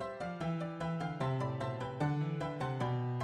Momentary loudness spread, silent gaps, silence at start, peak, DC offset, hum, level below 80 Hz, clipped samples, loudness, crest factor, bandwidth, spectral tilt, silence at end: 3 LU; none; 0 s; -22 dBFS; under 0.1%; none; -62 dBFS; under 0.1%; -37 LUFS; 14 dB; 10 kHz; -7.5 dB/octave; 0 s